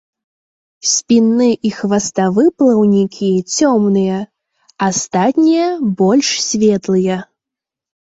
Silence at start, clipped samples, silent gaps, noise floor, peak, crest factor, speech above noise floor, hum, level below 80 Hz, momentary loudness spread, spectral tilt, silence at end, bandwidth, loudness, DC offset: 0.85 s; under 0.1%; none; -85 dBFS; -2 dBFS; 12 dB; 72 dB; none; -56 dBFS; 7 LU; -4.5 dB/octave; 0.9 s; 8 kHz; -14 LUFS; under 0.1%